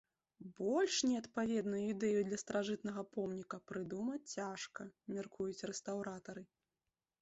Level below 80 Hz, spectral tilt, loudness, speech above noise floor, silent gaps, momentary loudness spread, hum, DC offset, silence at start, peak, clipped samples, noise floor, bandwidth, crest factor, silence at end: -78 dBFS; -4.5 dB/octave; -40 LUFS; over 50 dB; none; 12 LU; none; under 0.1%; 0.4 s; -24 dBFS; under 0.1%; under -90 dBFS; 8 kHz; 16 dB; 0.75 s